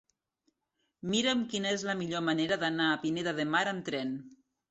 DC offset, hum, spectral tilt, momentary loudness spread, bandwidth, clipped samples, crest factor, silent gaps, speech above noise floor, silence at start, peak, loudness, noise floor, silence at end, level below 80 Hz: under 0.1%; none; -4 dB/octave; 7 LU; 8.4 kHz; under 0.1%; 18 dB; none; 50 dB; 1.05 s; -14 dBFS; -31 LUFS; -81 dBFS; 0.35 s; -72 dBFS